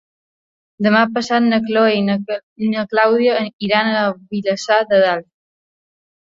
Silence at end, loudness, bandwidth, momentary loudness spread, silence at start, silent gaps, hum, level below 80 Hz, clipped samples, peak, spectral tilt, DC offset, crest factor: 1.1 s; -16 LUFS; 7.8 kHz; 8 LU; 0.8 s; 2.43-2.56 s, 3.53-3.59 s; none; -62 dBFS; under 0.1%; -2 dBFS; -5.5 dB/octave; under 0.1%; 16 dB